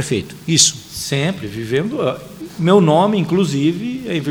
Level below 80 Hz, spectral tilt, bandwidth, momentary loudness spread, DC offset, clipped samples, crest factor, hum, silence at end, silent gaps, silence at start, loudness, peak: -50 dBFS; -4 dB/octave; over 20 kHz; 12 LU; under 0.1%; under 0.1%; 16 dB; none; 0 s; none; 0 s; -16 LUFS; 0 dBFS